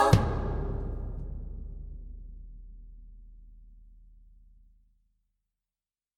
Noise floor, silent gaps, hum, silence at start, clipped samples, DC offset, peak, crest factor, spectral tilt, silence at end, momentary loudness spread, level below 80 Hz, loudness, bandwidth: under -90 dBFS; none; none; 0 s; under 0.1%; under 0.1%; -4 dBFS; 28 dB; -6.5 dB/octave; 1.95 s; 25 LU; -40 dBFS; -33 LUFS; 14.5 kHz